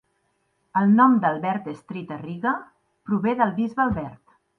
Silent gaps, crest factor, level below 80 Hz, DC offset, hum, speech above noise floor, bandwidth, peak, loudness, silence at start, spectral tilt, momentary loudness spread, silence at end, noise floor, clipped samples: none; 20 dB; -54 dBFS; under 0.1%; none; 48 dB; 4.4 kHz; -4 dBFS; -22 LUFS; 0.75 s; -9 dB/octave; 17 LU; 0.45 s; -70 dBFS; under 0.1%